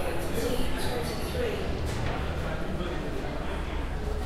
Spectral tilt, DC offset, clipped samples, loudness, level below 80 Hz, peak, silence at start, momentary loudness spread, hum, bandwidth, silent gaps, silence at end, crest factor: -5.5 dB/octave; under 0.1%; under 0.1%; -32 LUFS; -34 dBFS; -14 dBFS; 0 s; 4 LU; none; 15 kHz; none; 0 s; 14 dB